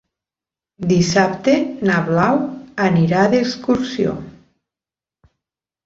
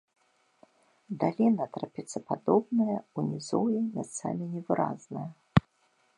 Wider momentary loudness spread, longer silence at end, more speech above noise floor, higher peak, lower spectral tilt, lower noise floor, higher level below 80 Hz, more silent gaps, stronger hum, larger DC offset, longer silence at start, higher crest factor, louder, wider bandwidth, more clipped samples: second, 7 LU vs 12 LU; first, 1.55 s vs 0.6 s; first, over 74 dB vs 40 dB; about the same, -2 dBFS vs -4 dBFS; about the same, -6 dB/octave vs -7 dB/octave; first, under -90 dBFS vs -70 dBFS; first, -52 dBFS vs -58 dBFS; neither; neither; neither; second, 0.8 s vs 1.1 s; second, 18 dB vs 26 dB; first, -17 LUFS vs -30 LUFS; second, 7.8 kHz vs 11 kHz; neither